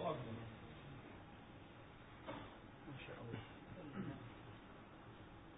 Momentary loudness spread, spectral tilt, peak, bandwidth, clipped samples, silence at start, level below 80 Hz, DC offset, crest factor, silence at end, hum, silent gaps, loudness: 9 LU; -4.5 dB/octave; -30 dBFS; 3.8 kHz; under 0.1%; 0 s; -68 dBFS; under 0.1%; 22 dB; 0 s; none; none; -54 LUFS